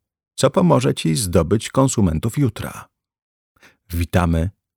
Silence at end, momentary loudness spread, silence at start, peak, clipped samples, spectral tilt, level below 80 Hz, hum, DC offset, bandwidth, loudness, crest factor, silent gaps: 0.25 s; 14 LU; 0.4 s; -2 dBFS; under 0.1%; -6 dB/octave; -36 dBFS; none; under 0.1%; 19 kHz; -19 LUFS; 18 dB; 3.22-3.55 s